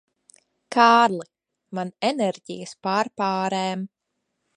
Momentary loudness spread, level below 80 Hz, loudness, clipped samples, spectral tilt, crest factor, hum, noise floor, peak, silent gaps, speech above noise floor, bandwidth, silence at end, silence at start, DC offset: 18 LU; -78 dBFS; -22 LUFS; under 0.1%; -4.5 dB/octave; 22 dB; none; -78 dBFS; -2 dBFS; none; 56 dB; 11.5 kHz; 0.7 s; 0.7 s; under 0.1%